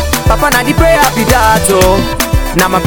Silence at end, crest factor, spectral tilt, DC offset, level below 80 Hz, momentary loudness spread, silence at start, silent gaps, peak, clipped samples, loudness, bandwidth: 0 s; 10 dB; -4 dB/octave; under 0.1%; -18 dBFS; 4 LU; 0 s; none; 0 dBFS; 2%; -9 LUFS; over 20 kHz